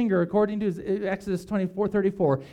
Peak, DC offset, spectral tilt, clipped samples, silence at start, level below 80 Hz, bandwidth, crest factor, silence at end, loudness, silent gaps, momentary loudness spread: -12 dBFS; under 0.1%; -8.5 dB/octave; under 0.1%; 0 s; -56 dBFS; 12 kHz; 14 dB; 0 s; -26 LUFS; none; 6 LU